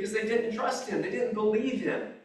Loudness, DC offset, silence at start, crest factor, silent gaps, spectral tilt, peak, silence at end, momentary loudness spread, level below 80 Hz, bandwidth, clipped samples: -29 LUFS; under 0.1%; 0 s; 14 dB; none; -5 dB/octave; -16 dBFS; 0.05 s; 4 LU; -70 dBFS; 12 kHz; under 0.1%